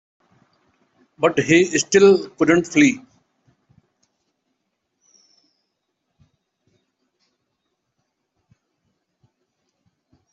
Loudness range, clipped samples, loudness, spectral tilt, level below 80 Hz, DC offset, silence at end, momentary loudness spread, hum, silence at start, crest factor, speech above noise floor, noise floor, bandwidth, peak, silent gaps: 7 LU; under 0.1%; -16 LUFS; -4.5 dB/octave; -64 dBFS; under 0.1%; 7.35 s; 7 LU; none; 1.2 s; 20 dB; 60 dB; -76 dBFS; 8.2 kHz; -2 dBFS; none